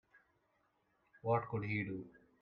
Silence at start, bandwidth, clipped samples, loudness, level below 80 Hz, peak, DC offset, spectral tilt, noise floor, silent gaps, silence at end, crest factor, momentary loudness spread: 1.25 s; 5.4 kHz; under 0.1%; -40 LUFS; -74 dBFS; -22 dBFS; under 0.1%; -10 dB/octave; -79 dBFS; none; 0.3 s; 20 dB; 12 LU